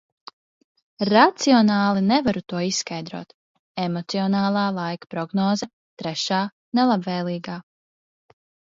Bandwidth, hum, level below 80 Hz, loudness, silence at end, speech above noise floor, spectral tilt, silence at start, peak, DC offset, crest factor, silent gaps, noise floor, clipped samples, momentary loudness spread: 7.8 kHz; none; -62 dBFS; -22 LUFS; 1.05 s; over 69 dB; -5 dB/octave; 1 s; 0 dBFS; under 0.1%; 22 dB; 3.34-3.75 s, 5.73-5.97 s, 6.52-6.72 s; under -90 dBFS; under 0.1%; 16 LU